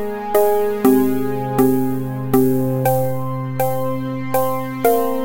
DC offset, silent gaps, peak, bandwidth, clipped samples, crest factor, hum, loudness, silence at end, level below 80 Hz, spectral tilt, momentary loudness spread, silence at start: under 0.1%; none; -2 dBFS; 17 kHz; under 0.1%; 16 dB; none; -18 LUFS; 0 s; -50 dBFS; -7 dB/octave; 7 LU; 0 s